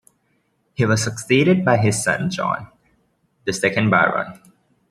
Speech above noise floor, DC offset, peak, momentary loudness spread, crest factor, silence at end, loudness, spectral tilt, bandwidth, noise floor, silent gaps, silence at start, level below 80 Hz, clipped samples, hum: 48 dB; under 0.1%; -2 dBFS; 12 LU; 18 dB; 0.55 s; -19 LUFS; -5 dB/octave; 13.5 kHz; -66 dBFS; none; 0.8 s; -56 dBFS; under 0.1%; none